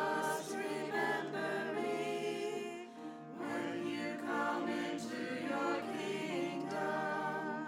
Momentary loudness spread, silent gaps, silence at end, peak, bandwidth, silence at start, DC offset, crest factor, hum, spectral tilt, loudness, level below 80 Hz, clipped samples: 5 LU; none; 0 s; -24 dBFS; 17 kHz; 0 s; under 0.1%; 14 dB; none; -4.5 dB/octave; -38 LUFS; under -90 dBFS; under 0.1%